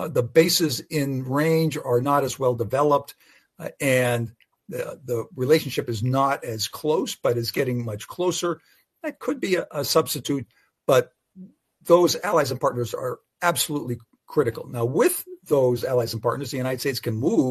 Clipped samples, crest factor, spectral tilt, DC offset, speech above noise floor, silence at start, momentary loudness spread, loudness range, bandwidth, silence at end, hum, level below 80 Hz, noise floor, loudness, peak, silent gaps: under 0.1%; 20 dB; -5 dB/octave; under 0.1%; 24 dB; 0 s; 12 LU; 3 LU; 13.5 kHz; 0 s; none; -62 dBFS; -47 dBFS; -23 LUFS; -4 dBFS; none